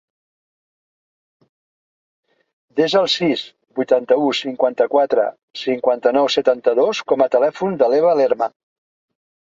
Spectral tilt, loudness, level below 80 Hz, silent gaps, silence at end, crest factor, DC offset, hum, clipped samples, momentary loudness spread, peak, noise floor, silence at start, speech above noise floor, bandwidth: -4.5 dB/octave; -17 LUFS; -68 dBFS; 5.43-5.48 s; 1.05 s; 18 dB; under 0.1%; none; under 0.1%; 8 LU; -2 dBFS; under -90 dBFS; 2.75 s; over 73 dB; 7.8 kHz